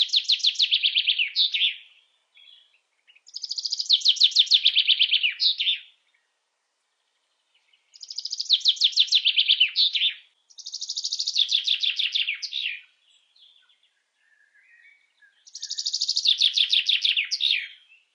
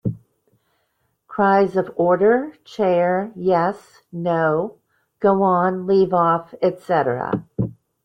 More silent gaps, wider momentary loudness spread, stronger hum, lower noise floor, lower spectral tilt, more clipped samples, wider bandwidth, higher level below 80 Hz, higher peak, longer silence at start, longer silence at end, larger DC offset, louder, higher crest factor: neither; first, 15 LU vs 11 LU; neither; first, -75 dBFS vs -69 dBFS; second, 10 dB/octave vs -8.5 dB/octave; neither; first, 10.5 kHz vs 7.6 kHz; second, under -90 dBFS vs -58 dBFS; about the same, -6 dBFS vs -4 dBFS; about the same, 0 s vs 0.05 s; about the same, 0.4 s vs 0.3 s; neither; about the same, -20 LUFS vs -19 LUFS; about the same, 20 dB vs 16 dB